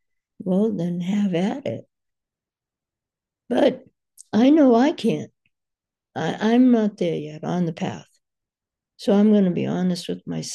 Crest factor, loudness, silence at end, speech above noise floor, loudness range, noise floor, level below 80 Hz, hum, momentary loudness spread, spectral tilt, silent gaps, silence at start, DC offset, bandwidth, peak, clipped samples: 16 dB; -21 LUFS; 0 s; 69 dB; 6 LU; -89 dBFS; -70 dBFS; none; 14 LU; -7 dB/octave; none; 0.4 s; under 0.1%; 12 kHz; -6 dBFS; under 0.1%